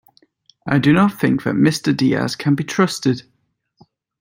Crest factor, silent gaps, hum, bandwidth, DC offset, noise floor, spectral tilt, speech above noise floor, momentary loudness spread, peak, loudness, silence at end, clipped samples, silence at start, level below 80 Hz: 16 dB; none; none; 16.5 kHz; under 0.1%; -67 dBFS; -6 dB/octave; 50 dB; 6 LU; -2 dBFS; -17 LUFS; 1 s; under 0.1%; 0.65 s; -54 dBFS